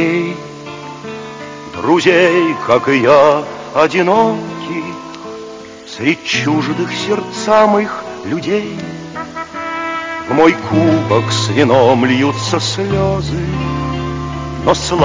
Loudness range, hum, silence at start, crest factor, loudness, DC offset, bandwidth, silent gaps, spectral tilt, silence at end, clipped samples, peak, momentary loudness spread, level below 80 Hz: 5 LU; none; 0 s; 14 dB; -14 LUFS; under 0.1%; 7.6 kHz; none; -5.5 dB/octave; 0 s; under 0.1%; 0 dBFS; 17 LU; -38 dBFS